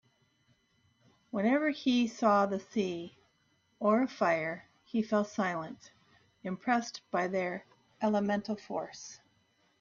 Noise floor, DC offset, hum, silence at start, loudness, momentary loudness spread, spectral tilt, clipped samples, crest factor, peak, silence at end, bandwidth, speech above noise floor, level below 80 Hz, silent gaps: -72 dBFS; under 0.1%; none; 1.35 s; -32 LUFS; 15 LU; -5.5 dB/octave; under 0.1%; 18 dB; -14 dBFS; 0.65 s; 7.4 kHz; 41 dB; -76 dBFS; none